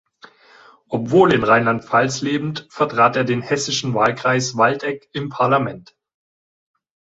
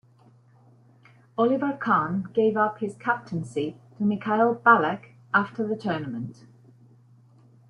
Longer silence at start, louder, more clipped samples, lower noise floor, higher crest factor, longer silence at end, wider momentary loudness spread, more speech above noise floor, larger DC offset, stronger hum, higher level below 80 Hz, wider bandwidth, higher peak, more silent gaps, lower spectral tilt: second, 0.9 s vs 1.4 s; first, -18 LUFS vs -25 LUFS; neither; second, -49 dBFS vs -57 dBFS; about the same, 18 dB vs 22 dB; about the same, 1.4 s vs 1.35 s; about the same, 12 LU vs 14 LU; about the same, 31 dB vs 32 dB; neither; neither; first, -56 dBFS vs -68 dBFS; second, 8 kHz vs 11 kHz; about the same, -2 dBFS vs -4 dBFS; neither; second, -5 dB/octave vs -7.5 dB/octave